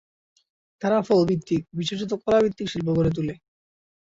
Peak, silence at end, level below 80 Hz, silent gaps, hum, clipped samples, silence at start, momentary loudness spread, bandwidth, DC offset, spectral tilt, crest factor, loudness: -8 dBFS; 0.7 s; -50 dBFS; none; none; under 0.1%; 0.8 s; 9 LU; 7.8 kHz; under 0.1%; -7 dB/octave; 16 dB; -24 LUFS